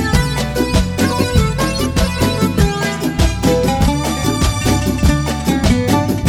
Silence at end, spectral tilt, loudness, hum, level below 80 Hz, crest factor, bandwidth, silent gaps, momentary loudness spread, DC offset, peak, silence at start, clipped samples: 0 s; -5.5 dB/octave; -16 LUFS; none; -22 dBFS; 14 dB; over 20 kHz; none; 3 LU; 0.1%; 0 dBFS; 0 s; under 0.1%